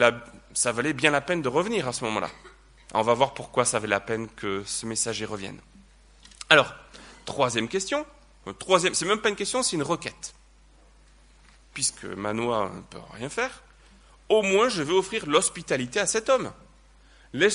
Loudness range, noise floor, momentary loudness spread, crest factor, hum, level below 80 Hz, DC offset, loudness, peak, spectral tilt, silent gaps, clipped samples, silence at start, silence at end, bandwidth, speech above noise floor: 7 LU; -55 dBFS; 17 LU; 26 dB; none; -56 dBFS; under 0.1%; -25 LUFS; 0 dBFS; -3 dB/octave; none; under 0.1%; 0 s; 0 s; 11 kHz; 30 dB